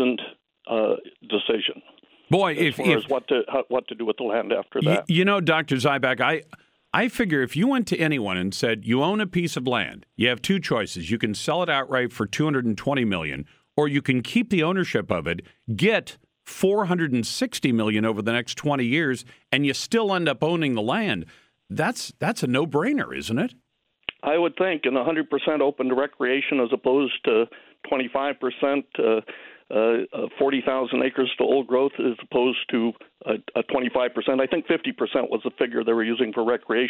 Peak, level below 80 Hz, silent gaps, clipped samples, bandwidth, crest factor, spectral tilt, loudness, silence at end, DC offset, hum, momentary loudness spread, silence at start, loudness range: -4 dBFS; -60 dBFS; none; under 0.1%; 19 kHz; 20 dB; -5.5 dB/octave; -24 LUFS; 0 s; under 0.1%; none; 7 LU; 0 s; 2 LU